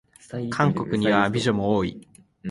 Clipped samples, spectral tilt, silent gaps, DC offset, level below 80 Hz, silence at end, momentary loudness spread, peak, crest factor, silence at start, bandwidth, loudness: under 0.1%; -6.5 dB/octave; none; under 0.1%; -52 dBFS; 0 s; 13 LU; -4 dBFS; 20 dB; 0.3 s; 11.5 kHz; -23 LUFS